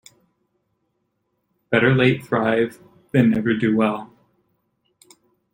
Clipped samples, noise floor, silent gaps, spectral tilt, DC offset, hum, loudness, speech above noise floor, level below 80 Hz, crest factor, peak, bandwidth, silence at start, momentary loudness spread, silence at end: under 0.1%; -72 dBFS; none; -7.5 dB/octave; under 0.1%; none; -19 LUFS; 54 dB; -58 dBFS; 20 dB; -2 dBFS; 16 kHz; 1.7 s; 6 LU; 1.5 s